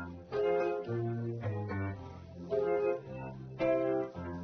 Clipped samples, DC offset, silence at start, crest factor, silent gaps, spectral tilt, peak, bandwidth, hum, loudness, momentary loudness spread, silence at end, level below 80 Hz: under 0.1%; under 0.1%; 0 s; 16 dB; none; -7.5 dB/octave; -20 dBFS; 6.4 kHz; none; -35 LUFS; 13 LU; 0 s; -62 dBFS